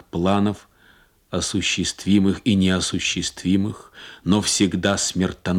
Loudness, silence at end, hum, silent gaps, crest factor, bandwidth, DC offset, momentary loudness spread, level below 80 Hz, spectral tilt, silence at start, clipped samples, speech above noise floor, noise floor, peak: -21 LUFS; 0 s; none; none; 18 dB; 14 kHz; under 0.1%; 10 LU; -50 dBFS; -4 dB/octave; 0.15 s; under 0.1%; 34 dB; -55 dBFS; -4 dBFS